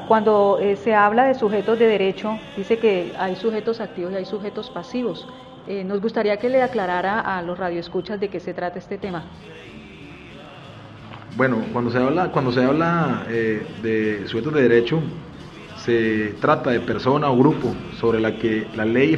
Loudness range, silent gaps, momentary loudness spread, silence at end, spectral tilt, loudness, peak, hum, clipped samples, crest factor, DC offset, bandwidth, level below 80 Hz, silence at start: 8 LU; none; 22 LU; 0 s; -7.5 dB/octave; -21 LUFS; -2 dBFS; none; under 0.1%; 18 dB; under 0.1%; 7.8 kHz; -54 dBFS; 0 s